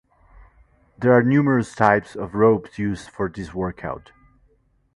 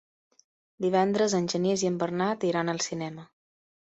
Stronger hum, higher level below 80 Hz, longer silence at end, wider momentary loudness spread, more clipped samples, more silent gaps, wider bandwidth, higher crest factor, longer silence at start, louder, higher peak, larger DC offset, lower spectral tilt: neither; first, -48 dBFS vs -70 dBFS; first, 0.95 s vs 0.65 s; first, 13 LU vs 9 LU; neither; neither; first, 11.5 kHz vs 8.4 kHz; about the same, 22 dB vs 18 dB; first, 1 s vs 0.8 s; first, -20 LUFS vs -27 LUFS; first, 0 dBFS vs -10 dBFS; neither; first, -8 dB/octave vs -5 dB/octave